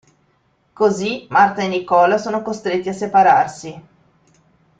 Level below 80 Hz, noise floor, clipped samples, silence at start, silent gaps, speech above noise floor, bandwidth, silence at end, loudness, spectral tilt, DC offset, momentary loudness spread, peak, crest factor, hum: -60 dBFS; -61 dBFS; under 0.1%; 0.8 s; none; 45 dB; 9.2 kHz; 1 s; -17 LUFS; -5 dB/octave; under 0.1%; 10 LU; -2 dBFS; 16 dB; none